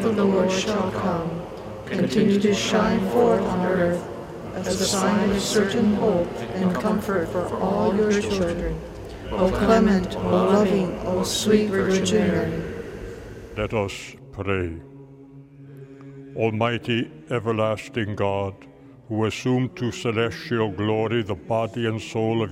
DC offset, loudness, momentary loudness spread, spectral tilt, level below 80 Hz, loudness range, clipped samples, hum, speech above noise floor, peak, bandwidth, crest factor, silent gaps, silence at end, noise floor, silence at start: under 0.1%; -23 LUFS; 14 LU; -5.5 dB/octave; -44 dBFS; 7 LU; under 0.1%; none; 23 dB; -4 dBFS; 16 kHz; 18 dB; none; 0 s; -45 dBFS; 0 s